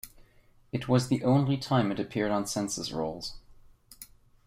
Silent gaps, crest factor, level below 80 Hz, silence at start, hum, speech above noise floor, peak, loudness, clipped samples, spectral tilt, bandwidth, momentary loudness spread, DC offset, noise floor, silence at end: none; 18 dB; -58 dBFS; 0.05 s; none; 32 dB; -12 dBFS; -29 LUFS; under 0.1%; -5.5 dB/octave; 16 kHz; 23 LU; under 0.1%; -60 dBFS; 0.4 s